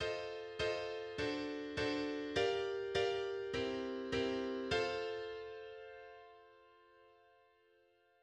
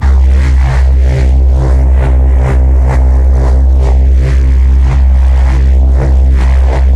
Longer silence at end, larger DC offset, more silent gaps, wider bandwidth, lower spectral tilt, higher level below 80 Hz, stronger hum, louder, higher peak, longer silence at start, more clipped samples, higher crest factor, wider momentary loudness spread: first, 1.15 s vs 0 s; neither; neither; first, 10 kHz vs 4.6 kHz; second, -4.5 dB/octave vs -8 dB/octave; second, -66 dBFS vs -6 dBFS; neither; second, -40 LUFS vs -9 LUFS; second, -22 dBFS vs 0 dBFS; about the same, 0 s vs 0 s; neither; first, 18 dB vs 6 dB; first, 15 LU vs 1 LU